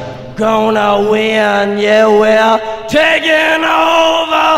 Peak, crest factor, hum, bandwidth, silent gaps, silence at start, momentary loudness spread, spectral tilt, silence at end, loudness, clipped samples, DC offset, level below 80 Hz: 0 dBFS; 10 dB; none; 16 kHz; none; 0 s; 5 LU; -4 dB/octave; 0 s; -10 LUFS; 0.3%; under 0.1%; -44 dBFS